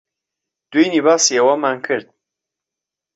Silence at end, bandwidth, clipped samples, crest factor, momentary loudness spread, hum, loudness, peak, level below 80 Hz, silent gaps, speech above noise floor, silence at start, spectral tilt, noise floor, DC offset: 1.15 s; 8.2 kHz; under 0.1%; 16 dB; 10 LU; none; -16 LUFS; -2 dBFS; -68 dBFS; none; 70 dB; 0.7 s; -2.5 dB/octave; -85 dBFS; under 0.1%